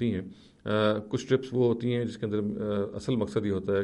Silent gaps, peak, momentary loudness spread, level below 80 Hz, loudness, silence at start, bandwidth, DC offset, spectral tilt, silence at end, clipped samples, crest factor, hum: none; -12 dBFS; 5 LU; -60 dBFS; -29 LUFS; 0 s; 11.5 kHz; under 0.1%; -7 dB/octave; 0 s; under 0.1%; 16 dB; none